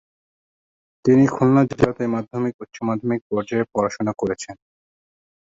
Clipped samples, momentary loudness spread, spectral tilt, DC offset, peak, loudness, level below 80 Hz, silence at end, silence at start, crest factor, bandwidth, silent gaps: under 0.1%; 10 LU; -7.5 dB/octave; under 0.1%; -2 dBFS; -21 LUFS; -54 dBFS; 1.05 s; 1.05 s; 20 dB; 7.8 kHz; 2.54-2.59 s, 3.21-3.30 s